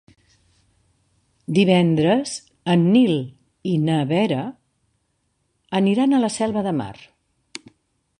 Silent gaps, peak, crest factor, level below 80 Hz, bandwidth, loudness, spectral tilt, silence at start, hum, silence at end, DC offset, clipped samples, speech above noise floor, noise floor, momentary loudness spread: none; -4 dBFS; 18 dB; -60 dBFS; 11 kHz; -20 LUFS; -6.5 dB/octave; 1.5 s; none; 1.25 s; under 0.1%; under 0.1%; 51 dB; -70 dBFS; 20 LU